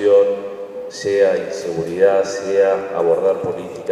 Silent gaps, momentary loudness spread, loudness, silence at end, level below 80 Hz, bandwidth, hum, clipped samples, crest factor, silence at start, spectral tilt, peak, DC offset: none; 11 LU; -18 LUFS; 0 s; -62 dBFS; 10.5 kHz; none; under 0.1%; 14 dB; 0 s; -5 dB/octave; -2 dBFS; under 0.1%